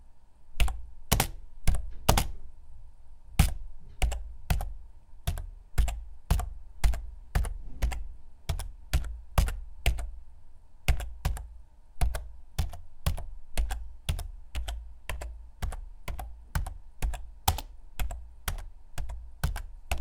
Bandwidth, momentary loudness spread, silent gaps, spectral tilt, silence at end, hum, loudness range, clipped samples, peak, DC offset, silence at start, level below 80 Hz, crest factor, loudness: 18 kHz; 14 LU; none; -4 dB/octave; 0 s; none; 6 LU; under 0.1%; -2 dBFS; under 0.1%; 0 s; -34 dBFS; 28 dB; -35 LUFS